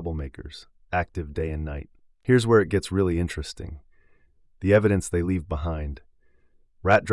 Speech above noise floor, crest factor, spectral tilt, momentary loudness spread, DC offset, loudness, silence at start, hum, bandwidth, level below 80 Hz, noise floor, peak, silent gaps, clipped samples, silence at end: 35 dB; 18 dB; -6.5 dB/octave; 19 LU; under 0.1%; -25 LUFS; 0 s; none; 12 kHz; -42 dBFS; -59 dBFS; -8 dBFS; none; under 0.1%; 0 s